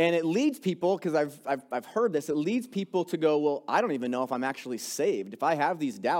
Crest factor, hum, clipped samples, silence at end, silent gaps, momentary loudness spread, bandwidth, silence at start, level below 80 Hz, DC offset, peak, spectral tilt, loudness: 16 dB; none; under 0.1%; 0 s; none; 6 LU; 17 kHz; 0 s; -80 dBFS; under 0.1%; -12 dBFS; -5 dB/octave; -29 LUFS